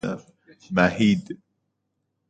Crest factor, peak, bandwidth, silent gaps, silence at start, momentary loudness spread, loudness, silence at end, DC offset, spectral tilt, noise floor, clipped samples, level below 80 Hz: 22 dB; -2 dBFS; 9 kHz; none; 0.05 s; 21 LU; -22 LUFS; 0.95 s; under 0.1%; -6.5 dB/octave; -77 dBFS; under 0.1%; -54 dBFS